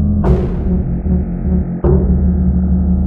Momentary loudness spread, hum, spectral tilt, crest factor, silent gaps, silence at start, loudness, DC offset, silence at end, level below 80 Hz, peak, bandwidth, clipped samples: 4 LU; none; -12.5 dB/octave; 12 dB; none; 0 s; -15 LUFS; under 0.1%; 0 s; -18 dBFS; 0 dBFS; 2.8 kHz; under 0.1%